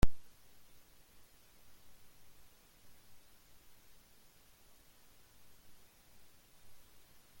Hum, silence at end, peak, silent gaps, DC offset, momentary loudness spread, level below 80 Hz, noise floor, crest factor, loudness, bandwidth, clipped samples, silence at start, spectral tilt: none; 4.25 s; -12 dBFS; none; under 0.1%; 1 LU; -50 dBFS; -64 dBFS; 26 dB; -58 LUFS; 17 kHz; under 0.1%; 0.05 s; -5.5 dB/octave